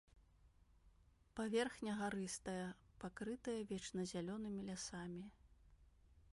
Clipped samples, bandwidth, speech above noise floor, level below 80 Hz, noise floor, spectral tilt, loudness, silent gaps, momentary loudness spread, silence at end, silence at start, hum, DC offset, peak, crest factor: under 0.1%; 11.5 kHz; 26 dB; -70 dBFS; -71 dBFS; -4.5 dB/octave; -46 LUFS; none; 12 LU; 0 s; 0.15 s; none; under 0.1%; -28 dBFS; 20 dB